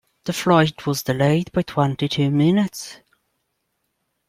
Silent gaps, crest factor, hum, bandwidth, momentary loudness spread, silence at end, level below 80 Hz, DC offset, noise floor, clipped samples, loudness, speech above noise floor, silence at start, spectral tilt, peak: none; 18 dB; none; 16 kHz; 9 LU; 1.35 s; -56 dBFS; under 0.1%; -73 dBFS; under 0.1%; -20 LUFS; 54 dB; 0.25 s; -6 dB/octave; -2 dBFS